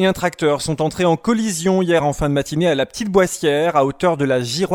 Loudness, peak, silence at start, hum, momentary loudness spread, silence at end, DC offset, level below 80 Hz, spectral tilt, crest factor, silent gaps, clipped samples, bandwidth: -18 LUFS; 0 dBFS; 0 s; none; 3 LU; 0 s; under 0.1%; -44 dBFS; -5 dB/octave; 16 dB; none; under 0.1%; 18 kHz